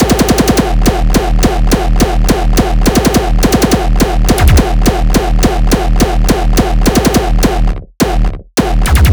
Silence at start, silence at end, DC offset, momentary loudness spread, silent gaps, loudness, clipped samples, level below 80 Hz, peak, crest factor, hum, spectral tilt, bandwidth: 0 s; 0 s; under 0.1%; 4 LU; none; -11 LUFS; 1%; -12 dBFS; 0 dBFS; 8 dB; none; -5 dB/octave; over 20 kHz